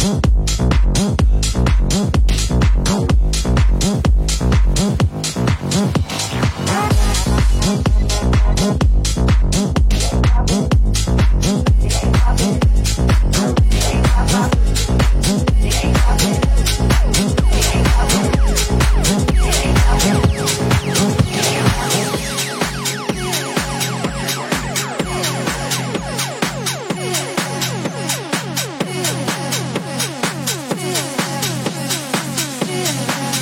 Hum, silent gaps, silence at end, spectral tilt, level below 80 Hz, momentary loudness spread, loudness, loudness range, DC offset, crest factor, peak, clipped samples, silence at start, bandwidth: none; none; 0 s; -4.5 dB/octave; -18 dBFS; 5 LU; -17 LUFS; 5 LU; under 0.1%; 14 dB; 0 dBFS; under 0.1%; 0 s; 17 kHz